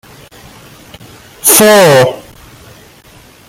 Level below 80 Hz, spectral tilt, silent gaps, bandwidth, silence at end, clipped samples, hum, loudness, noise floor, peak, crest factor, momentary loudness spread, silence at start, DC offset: -48 dBFS; -3 dB/octave; none; over 20 kHz; 1.3 s; 0.3%; none; -6 LUFS; -39 dBFS; 0 dBFS; 12 dB; 10 LU; 1.45 s; under 0.1%